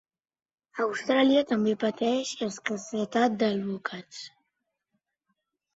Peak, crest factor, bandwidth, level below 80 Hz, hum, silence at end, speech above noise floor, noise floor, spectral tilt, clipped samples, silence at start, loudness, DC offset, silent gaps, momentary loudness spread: -10 dBFS; 18 dB; 8 kHz; -72 dBFS; none; 1.45 s; 55 dB; -82 dBFS; -4.5 dB/octave; under 0.1%; 0.75 s; -27 LUFS; under 0.1%; none; 18 LU